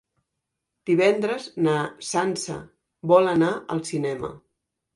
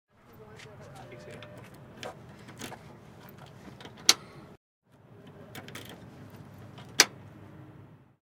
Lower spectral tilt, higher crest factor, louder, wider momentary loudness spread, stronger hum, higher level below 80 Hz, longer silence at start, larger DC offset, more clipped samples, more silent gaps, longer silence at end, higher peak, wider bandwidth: first, -5.5 dB/octave vs -0.5 dB/octave; second, 20 dB vs 36 dB; first, -23 LUFS vs -27 LUFS; second, 15 LU vs 27 LU; neither; first, -62 dBFS vs -70 dBFS; first, 0.85 s vs 0.2 s; neither; neither; second, none vs 4.57-4.82 s; first, 0.55 s vs 0.25 s; second, -4 dBFS vs 0 dBFS; second, 11.5 kHz vs 17.5 kHz